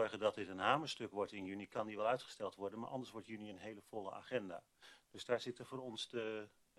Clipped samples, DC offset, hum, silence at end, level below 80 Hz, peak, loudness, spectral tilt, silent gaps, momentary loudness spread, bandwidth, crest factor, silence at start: under 0.1%; under 0.1%; none; 0.3 s; -82 dBFS; -20 dBFS; -43 LUFS; -4.5 dB/octave; none; 13 LU; 13 kHz; 22 dB; 0 s